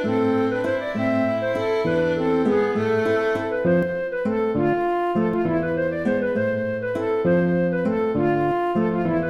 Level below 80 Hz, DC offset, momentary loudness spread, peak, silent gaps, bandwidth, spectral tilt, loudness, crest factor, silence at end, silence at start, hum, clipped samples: -50 dBFS; under 0.1%; 4 LU; -10 dBFS; none; 11.5 kHz; -8 dB/octave; -22 LUFS; 12 dB; 0 s; 0 s; none; under 0.1%